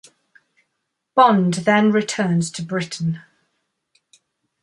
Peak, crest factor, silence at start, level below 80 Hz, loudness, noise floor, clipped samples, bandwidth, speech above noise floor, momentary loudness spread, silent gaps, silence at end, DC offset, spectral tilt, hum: -2 dBFS; 20 dB; 1.15 s; -66 dBFS; -18 LUFS; -76 dBFS; under 0.1%; 11.5 kHz; 59 dB; 11 LU; none; 1.45 s; under 0.1%; -5.5 dB/octave; none